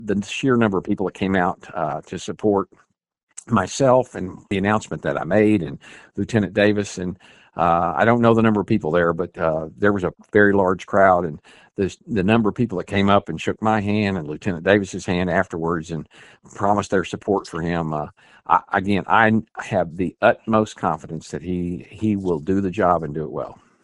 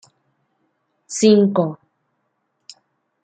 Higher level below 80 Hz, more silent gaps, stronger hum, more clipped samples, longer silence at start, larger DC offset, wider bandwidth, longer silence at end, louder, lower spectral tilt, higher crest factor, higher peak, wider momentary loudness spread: first, -50 dBFS vs -68 dBFS; first, 3.23-3.27 s vs none; neither; neither; second, 0 s vs 1.1 s; neither; first, 11 kHz vs 9.2 kHz; second, 0.3 s vs 1.5 s; second, -21 LUFS vs -17 LUFS; about the same, -6.5 dB/octave vs -5.5 dB/octave; about the same, 20 dB vs 20 dB; about the same, 0 dBFS vs -2 dBFS; second, 13 LU vs 17 LU